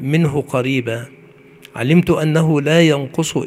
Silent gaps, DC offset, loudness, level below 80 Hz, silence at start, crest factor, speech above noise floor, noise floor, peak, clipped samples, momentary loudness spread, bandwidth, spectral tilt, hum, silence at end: none; under 0.1%; -16 LUFS; -48 dBFS; 0 s; 16 dB; 28 dB; -43 dBFS; 0 dBFS; under 0.1%; 11 LU; 14.5 kHz; -6 dB/octave; none; 0 s